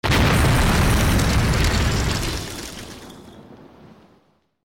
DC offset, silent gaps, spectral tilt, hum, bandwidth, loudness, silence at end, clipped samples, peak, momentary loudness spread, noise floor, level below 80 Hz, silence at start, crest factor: under 0.1%; none; -4.5 dB/octave; none; over 20 kHz; -19 LUFS; 1.1 s; under 0.1%; -12 dBFS; 19 LU; -61 dBFS; -26 dBFS; 0.05 s; 10 dB